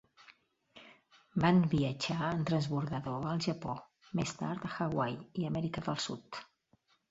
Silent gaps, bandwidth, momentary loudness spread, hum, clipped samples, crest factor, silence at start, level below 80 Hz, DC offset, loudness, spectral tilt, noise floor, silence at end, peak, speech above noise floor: none; 8 kHz; 12 LU; none; under 0.1%; 22 dB; 0.3 s; -64 dBFS; under 0.1%; -35 LUFS; -6 dB/octave; -72 dBFS; 0.65 s; -14 dBFS; 39 dB